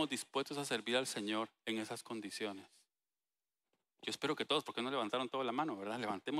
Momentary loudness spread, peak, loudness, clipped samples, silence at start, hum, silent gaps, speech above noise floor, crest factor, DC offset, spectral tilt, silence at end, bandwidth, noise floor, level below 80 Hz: 8 LU; -20 dBFS; -40 LUFS; under 0.1%; 0 s; none; none; over 50 dB; 20 dB; under 0.1%; -3 dB/octave; 0 s; 15.5 kHz; under -90 dBFS; under -90 dBFS